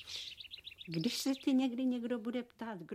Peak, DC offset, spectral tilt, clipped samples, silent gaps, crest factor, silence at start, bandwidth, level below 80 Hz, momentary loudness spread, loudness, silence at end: -22 dBFS; under 0.1%; -4.5 dB/octave; under 0.1%; none; 16 dB; 0 s; 15.5 kHz; -76 dBFS; 14 LU; -37 LUFS; 0 s